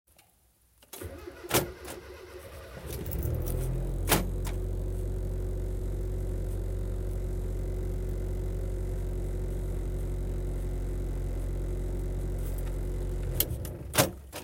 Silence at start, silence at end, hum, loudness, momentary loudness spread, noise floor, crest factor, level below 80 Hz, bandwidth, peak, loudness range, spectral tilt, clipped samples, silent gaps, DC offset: 0.95 s; 0 s; none; -34 LUFS; 14 LU; -65 dBFS; 24 dB; -34 dBFS; 17 kHz; -8 dBFS; 3 LU; -4.5 dB/octave; under 0.1%; none; under 0.1%